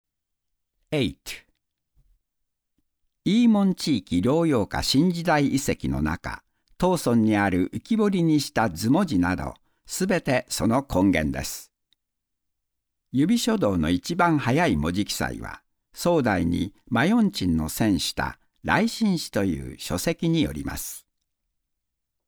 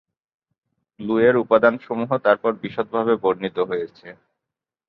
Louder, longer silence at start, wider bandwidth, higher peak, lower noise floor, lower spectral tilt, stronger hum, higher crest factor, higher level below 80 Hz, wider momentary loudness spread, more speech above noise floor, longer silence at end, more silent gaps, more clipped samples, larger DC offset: second, -24 LUFS vs -20 LUFS; about the same, 0.9 s vs 1 s; first, over 20 kHz vs 5 kHz; second, -6 dBFS vs -2 dBFS; about the same, -83 dBFS vs -86 dBFS; second, -5.5 dB/octave vs -9 dB/octave; neither; about the same, 18 dB vs 20 dB; first, -44 dBFS vs -64 dBFS; about the same, 11 LU vs 11 LU; second, 60 dB vs 66 dB; first, 1.3 s vs 0.75 s; neither; neither; neither